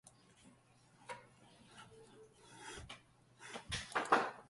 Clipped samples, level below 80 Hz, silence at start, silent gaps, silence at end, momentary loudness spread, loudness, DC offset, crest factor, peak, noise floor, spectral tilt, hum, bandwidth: under 0.1%; -68 dBFS; 0.05 s; none; 0.05 s; 28 LU; -41 LUFS; under 0.1%; 30 dB; -16 dBFS; -68 dBFS; -3 dB/octave; none; 11.5 kHz